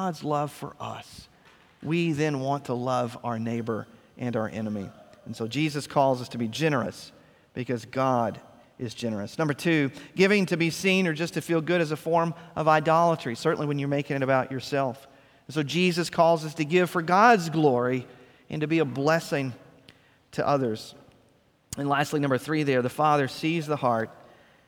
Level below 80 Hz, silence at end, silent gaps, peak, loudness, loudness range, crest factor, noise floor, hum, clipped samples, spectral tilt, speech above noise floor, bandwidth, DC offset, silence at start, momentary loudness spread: -66 dBFS; 0.55 s; none; -4 dBFS; -26 LUFS; 6 LU; 22 dB; -63 dBFS; none; under 0.1%; -6 dB/octave; 37 dB; 18.5 kHz; under 0.1%; 0 s; 15 LU